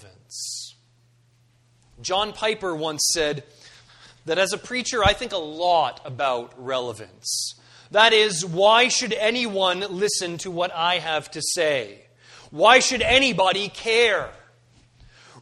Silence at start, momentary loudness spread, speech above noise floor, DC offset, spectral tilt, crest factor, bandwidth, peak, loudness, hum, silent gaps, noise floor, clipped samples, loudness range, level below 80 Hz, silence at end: 0.05 s; 15 LU; 38 dB; under 0.1%; -2 dB/octave; 22 dB; 13 kHz; -2 dBFS; -21 LUFS; none; none; -60 dBFS; under 0.1%; 7 LU; -48 dBFS; 0 s